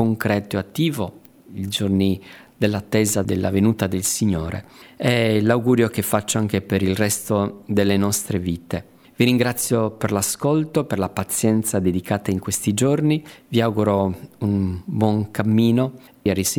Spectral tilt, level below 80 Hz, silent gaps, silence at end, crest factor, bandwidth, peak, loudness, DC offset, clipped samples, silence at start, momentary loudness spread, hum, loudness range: -5 dB/octave; -50 dBFS; none; 0 s; 18 dB; over 20 kHz; -4 dBFS; -21 LUFS; under 0.1%; under 0.1%; 0 s; 8 LU; none; 2 LU